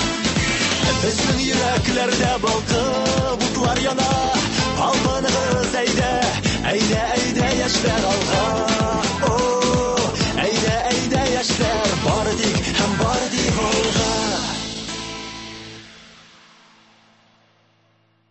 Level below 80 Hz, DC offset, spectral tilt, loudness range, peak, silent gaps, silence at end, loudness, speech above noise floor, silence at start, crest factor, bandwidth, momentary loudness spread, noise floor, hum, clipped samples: -36 dBFS; under 0.1%; -3.5 dB/octave; 5 LU; -6 dBFS; none; 2.25 s; -19 LUFS; 42 dB; 0 s; 16 dB; 8.6 kHz; 3 LU; -61 dBFS; none; under 0.1%